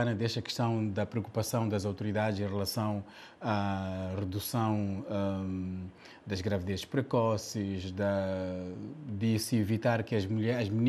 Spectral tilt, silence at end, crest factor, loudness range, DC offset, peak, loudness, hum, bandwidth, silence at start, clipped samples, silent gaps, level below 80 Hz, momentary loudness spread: -6 dB/octave; 0 s; 18 dB; 2 LU; under 0.1%; -14 dBFS; -33 LUFS; none; 14 kHz; 0 s; under 0.1%; none; -64 dBFS; 9 LU